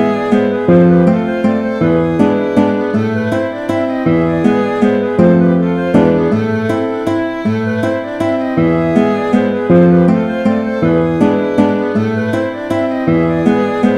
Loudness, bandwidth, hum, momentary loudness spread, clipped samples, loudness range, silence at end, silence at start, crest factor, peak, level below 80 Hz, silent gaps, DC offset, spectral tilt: -13 LUFS; 9.6 kHz; none; 7 LU; under 0.1%; 2 LU; 0 s; 0 s; 12 dB; 0 dBFS; -42 dBFS; none; under 0.1%; -8.5 dB/octave